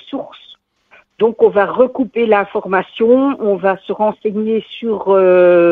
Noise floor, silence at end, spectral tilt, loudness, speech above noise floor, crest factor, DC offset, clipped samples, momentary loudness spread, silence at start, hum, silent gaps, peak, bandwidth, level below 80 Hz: -50 dBFS; 0 s; -9 dB/octave; -14 LUFS; 37 dB; 14 dB; under 0.1%; under 0.1%; 10 LU; 0.05 s; none; none; 0 dBFS; 4.3 kHz; -58 dBFS